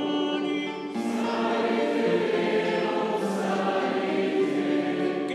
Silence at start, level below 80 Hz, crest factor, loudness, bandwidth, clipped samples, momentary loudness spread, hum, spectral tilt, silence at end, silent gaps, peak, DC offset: 0 s; -80 dBFS; 12 dB; -26 LUFS; 12.5 kHz; under 0.1%; 4 LU; none; -5.5 dB/octave; 0 s; none; -14 dBFS; under 0.1%